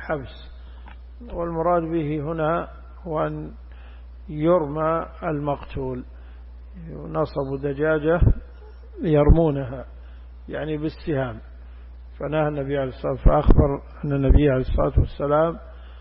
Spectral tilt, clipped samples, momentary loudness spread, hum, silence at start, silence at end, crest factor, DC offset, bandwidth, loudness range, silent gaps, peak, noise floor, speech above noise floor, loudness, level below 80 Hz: -12.5 dB/octave; under 0.1%; 24 LU; none; 0 s; 0 s; 18 dB; under 0.1%; 5.4 kHz; 6 LU; none; -6 dBFS; -41 dBFS; 20 dB; -23 LUFS; -28 dBFS